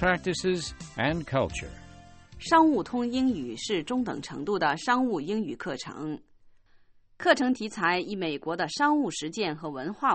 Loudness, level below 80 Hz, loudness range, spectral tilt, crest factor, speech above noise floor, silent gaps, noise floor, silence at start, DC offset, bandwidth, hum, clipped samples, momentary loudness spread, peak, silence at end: -28 LUFS; -54 dBFS; 3 LU; -4.5 dB/octave; 20 dB; 30 dB; none; -58 dBFS; 0 s; under 0.1%; 8.8 kHz; none; under 0.1%; 12 LU; -8 dBFS; 0 s